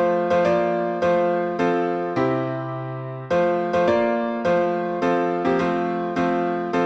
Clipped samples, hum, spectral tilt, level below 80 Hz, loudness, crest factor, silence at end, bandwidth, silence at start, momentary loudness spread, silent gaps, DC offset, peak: under 0.1%; none; -7.5 dB/octave; -58 dBFS; -22 LUFS; 14 dB; 0 s; 8 kHz; 0 s; 5 LU; none; under 0.1%; -8 dBFS